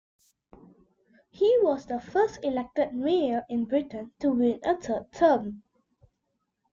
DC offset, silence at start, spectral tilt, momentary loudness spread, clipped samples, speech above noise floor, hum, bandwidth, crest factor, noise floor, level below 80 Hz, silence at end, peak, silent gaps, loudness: under 0.1%; 1.4 s; -6 dB/octave; 8 LU; under 0.1%; 53 dB; none; 7.6 kHz; 18 dB; -79 dBFS; -62 dBFS; 1.15 s; -10 dBFS; none; -27 LUFS